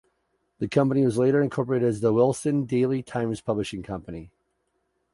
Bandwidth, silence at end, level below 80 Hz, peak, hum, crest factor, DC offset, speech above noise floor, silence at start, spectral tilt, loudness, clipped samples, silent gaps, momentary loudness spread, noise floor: 11.5 kHz; 0.85 s; -56 dBFS; -8 dBFS; none; 18 dB; under 0.1%; 50 dB; 0.6 s; -7 dB/octave; -24 LUFS; under 0.1%; none; 13 LU; -74 dBFS